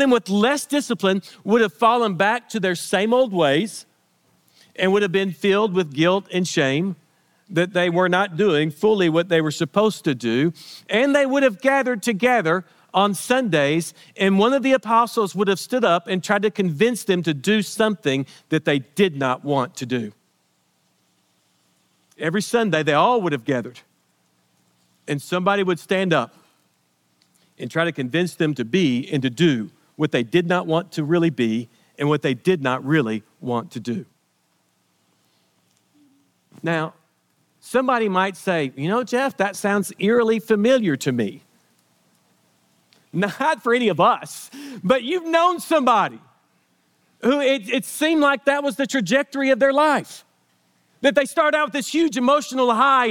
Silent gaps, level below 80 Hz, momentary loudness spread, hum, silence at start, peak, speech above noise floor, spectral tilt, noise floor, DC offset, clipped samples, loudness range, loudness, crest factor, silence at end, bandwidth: none; -72 dBFS; 9 LU; none; 0 s; -2 dBFS; 46 dB; -5 dB/octave; -66 dBFS; under 0.1%; under 0.1%; 5 LU; -20 LUFS; 18 dB; 0 s; 18 kHz